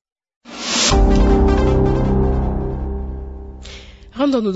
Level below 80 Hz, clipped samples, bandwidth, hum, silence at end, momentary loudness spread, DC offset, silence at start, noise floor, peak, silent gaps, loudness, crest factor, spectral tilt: -20 dBFS; under 0.1%; 8 kHz; none; 0 s; 21 LU; under 0.1%; 0.45 s; -37 dBFS; -4 dBFS; none; -17 LUFS; 14 dB; -5 dB/octave